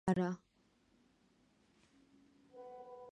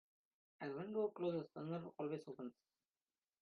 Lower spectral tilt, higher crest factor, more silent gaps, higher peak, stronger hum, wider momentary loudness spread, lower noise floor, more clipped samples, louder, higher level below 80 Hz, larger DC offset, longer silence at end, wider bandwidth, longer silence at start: about the same, -7.5 dB/octave vs -7 dB/octave; first, 24 dB vs 16 dB; neither; first, -20 dBFS vs -30 dBFS; neither; first, 21 LU vs 11 LU; second, -74 dBFS vs under -90 dBFS; neither; first, -41 LUFS vs -46 LUFS; first, -72 dBFS vs -88 dBFS; neither; second, 0 s vs 0.9 s; first, 10 kHz vs 6.6 kHz; second, 0.05 s vs 0.6 s